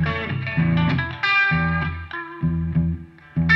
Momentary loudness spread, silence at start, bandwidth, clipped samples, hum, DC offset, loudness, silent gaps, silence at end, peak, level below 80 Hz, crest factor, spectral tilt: 12 LU; 0 s; 6 kHz; under 0.1%; none; under 0.1%; -22 LUFS; none; 0 s; -4 dBFS; -38 dBFS; 16 dB; -7.5 dB/octave